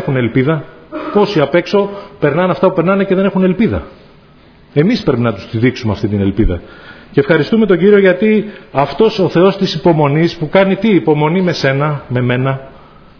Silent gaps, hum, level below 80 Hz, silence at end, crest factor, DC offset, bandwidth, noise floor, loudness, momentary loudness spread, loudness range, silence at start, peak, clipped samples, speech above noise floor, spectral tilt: none; none; -32 dBFS; 0.5 s; 12 dB; under 0.1%; 5.4 kHz; -43 dBFS; -13 LUFS; 7 LU; 4 LU; 0 s; 0 dBFS; under 0.1%; 31 dB; -8 dB/octave